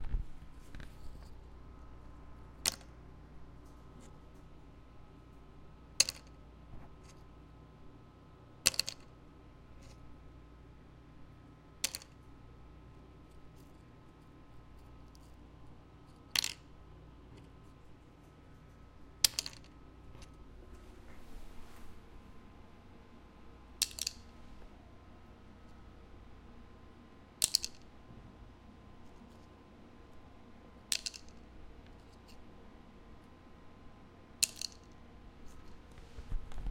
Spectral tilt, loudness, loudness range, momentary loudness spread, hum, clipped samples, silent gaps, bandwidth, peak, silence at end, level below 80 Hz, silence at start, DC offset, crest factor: -1 dB/octave; -35 LUFS; 17 LU; 25 LU; none; under 0.1%; none; 16 kHz; -6 dBFS; 0 s; -54 dBFS; 0 s; under 0.1%; 38 dB